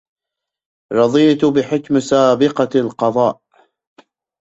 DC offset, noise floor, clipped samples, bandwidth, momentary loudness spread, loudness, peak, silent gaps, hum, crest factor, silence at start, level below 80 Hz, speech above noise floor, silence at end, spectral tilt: under 0.1%; -83 dBFS; under 0.1%; 8 kHz; 6 LU; -15 LUFS; -2 dBFS; none; none; 16 dB; 0.9 s; -58 dBFS; 69 dB; 1.05 s; -6 dB/octave